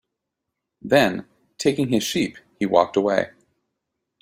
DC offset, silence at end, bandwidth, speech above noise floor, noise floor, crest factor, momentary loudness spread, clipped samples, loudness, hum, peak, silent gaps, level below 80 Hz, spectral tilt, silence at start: under 0.1%; 0.95 s; 16 kHz; 61 dB; -82 dBFS; 22 dB; 11 LU; under 0.1%; -21 LUFS; none; -2 dBFS; none; -60 dBFS; -4.5 dB/octave; 0.85 s